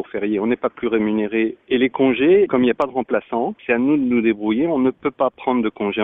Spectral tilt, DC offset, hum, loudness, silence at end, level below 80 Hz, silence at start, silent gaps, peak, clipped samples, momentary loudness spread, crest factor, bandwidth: -8.5 dB/octave; under 0.1%; none; -19 LUFS; 0 s; -54 dBFS; 0 s; none; -6 dBFS; under 0.1%; 7 LU; 14 dB; 3.9 kHz